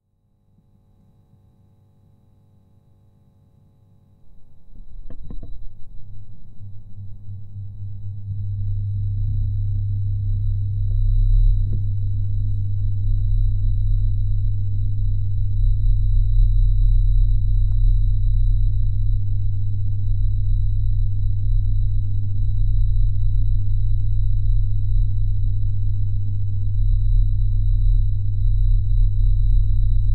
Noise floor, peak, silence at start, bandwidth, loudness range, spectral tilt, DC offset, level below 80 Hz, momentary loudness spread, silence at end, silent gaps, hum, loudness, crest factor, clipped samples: -63 dBFS; -6 dBFS; 4.25 s; 4.1 kHz; 10 LU; -11 dB/octave; under 0.1%; -20 dBFS; 13 LU; 0 s; none; none; -23 LUFS; 12 dB; under 0.1%